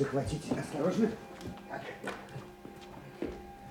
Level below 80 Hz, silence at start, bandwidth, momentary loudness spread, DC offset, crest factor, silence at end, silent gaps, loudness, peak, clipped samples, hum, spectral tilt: -56 dBFS; 0 s; 19.5 kHz; 17 LU; under 0.1%; 20 dB; 0 s; none; -37 LUFS; -18 dBFS; under 0.1%; none; -6.5 dB/octave